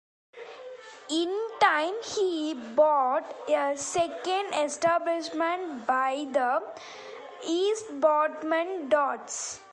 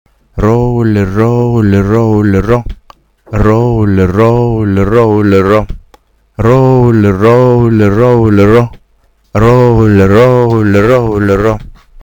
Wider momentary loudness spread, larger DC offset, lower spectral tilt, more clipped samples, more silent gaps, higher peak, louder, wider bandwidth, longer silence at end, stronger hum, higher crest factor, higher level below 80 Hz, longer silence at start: first, 19 LU vs 7 LU; neither; second, -2 dB/octave vs -9 dB/octave; second, under 0.1% vs 0.6%; neither; second, -8 dBFS vs 0 dBFS; second, -27 LUFS vs -8 LUFS; second, 11.5 kHz vs 18.5 kHz; second, 0 s vs 0.35 s; neither; first, 20 dB vs 8 dB; second, -74 dBFS vs -26 dBFS; about the same, 0.35 s vs 0.35 s